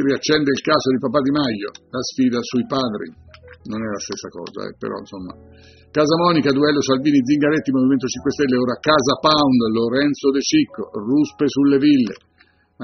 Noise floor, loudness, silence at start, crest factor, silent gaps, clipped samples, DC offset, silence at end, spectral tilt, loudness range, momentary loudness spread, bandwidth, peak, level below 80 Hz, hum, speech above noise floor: -57 dBFS; -18 LUFS; 0 s; 16 dB; none; under 0.1%; under 0.1%; 0 s; -4 dB/octave; 8 LU; 14 LU; 6.6 kHz; -2 dBFS; -54 dBFS; none; 38 dB